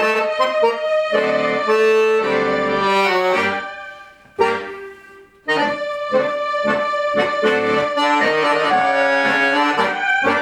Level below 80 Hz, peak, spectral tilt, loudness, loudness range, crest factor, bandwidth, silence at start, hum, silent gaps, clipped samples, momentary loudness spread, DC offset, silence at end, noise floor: -56 dBFS; -2 dBFS; -4 dB/octave; -17 LUFS; 5 LU; 16 dB; 13 kHz; 0 s; none; none; under 0.1%; 9 LU; under 0.1%; 0 s; -44 dBFS